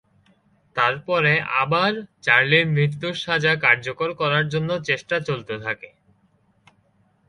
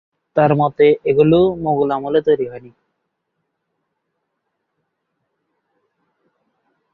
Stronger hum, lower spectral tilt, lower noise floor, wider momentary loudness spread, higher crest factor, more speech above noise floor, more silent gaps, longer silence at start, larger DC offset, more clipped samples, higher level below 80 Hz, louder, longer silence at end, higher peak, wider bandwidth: neither; second, -5.5 dB/octave vs -10 dB/octave; second, -62 dBFS vs -74 dBFS; first, 11 LU vs 8 LU; about the same, 22 dB vs 18 dB; second, 41 dB vs 59 dB; neither; first, 0.75 s vs 0.35 s; neither; neither; second, -60 dBFS vs -54 dBFS; second, -20 LUFS vs -16 LUFS; second, 1.4 s vs 4.25 s; about the same, 0 dBFS vs -2 dBFS; first, 10.5 kHz vs 4.4 kHz